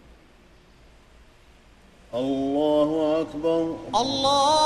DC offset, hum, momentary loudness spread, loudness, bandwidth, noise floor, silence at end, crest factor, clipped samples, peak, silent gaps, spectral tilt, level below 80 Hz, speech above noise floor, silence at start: under 0.1%; none; 7 LU; -23 LUFS; 13 kHz; -53 dBFS; 0 s; 16 dB; under 0.1%; -8 dBFS; none; -4 dB/octave; -54 dBFS; 31 dB; 2.1 s